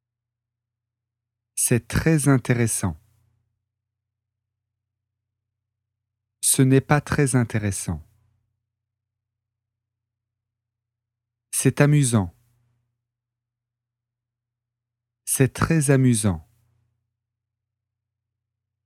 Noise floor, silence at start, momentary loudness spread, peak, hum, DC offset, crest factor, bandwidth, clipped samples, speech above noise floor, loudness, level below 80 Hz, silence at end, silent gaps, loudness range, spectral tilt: -86 dBFS; 1.55 s; 12 LU; -2 dBFS; 50 Hz at -60 dBFS; under 0.1%; 24 dB; 16 kHz; under 0.1%; 67 dB; -21 LUFS; -50 dBFS; 2.45 s; none; 9 LU; -5.5 dB/octave